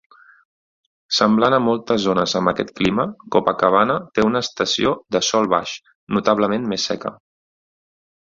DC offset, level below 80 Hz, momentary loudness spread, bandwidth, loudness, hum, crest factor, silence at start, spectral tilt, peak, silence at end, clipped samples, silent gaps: under 0.1%; -52 dBFS; 7 LU; 7.6 kHz; -19 LUFS; none; 18 dB; 1.1 s; -4.5 dB/octave; -2 dBFS; 1.15 s; under 0.1%; 5.95-6.07 s